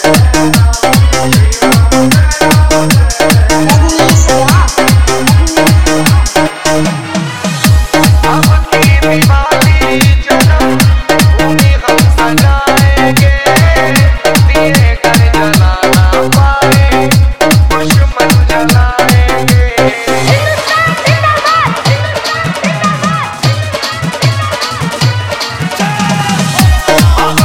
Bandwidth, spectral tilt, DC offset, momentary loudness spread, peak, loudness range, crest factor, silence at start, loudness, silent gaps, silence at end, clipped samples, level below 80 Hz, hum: 18 kHz; -5 dB/octave; 6%; 5 LU; 0 dBFS; 4 LU; 8 dB; 0 s; -8 LUFS; none; 0 s; 0.7%; -14 dBFS; none